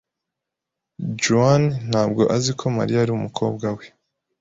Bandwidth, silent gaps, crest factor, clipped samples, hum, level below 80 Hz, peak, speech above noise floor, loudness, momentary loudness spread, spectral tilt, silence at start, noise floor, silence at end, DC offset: 8.2 kHz; none; 18 dB; under 0.1%; none; -54 dBFS; -4 dBFS; 64 dB; -20 LUFS; 12 LU; -5.5 dB/octave; 1 s; -84 dBFS; 0.55 s; under 0.1%